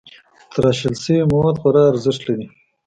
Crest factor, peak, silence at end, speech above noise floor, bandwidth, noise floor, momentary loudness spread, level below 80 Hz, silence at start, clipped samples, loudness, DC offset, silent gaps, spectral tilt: 16 dB; -2 dBFS; 0.4 s; 29 dB; 9.4 kHz; -45 dBFS; 12 LU; -46 dBFS; 0.5 s; under 0.1%; -17 LUFS; under 0.1%; none; -7 dB/octave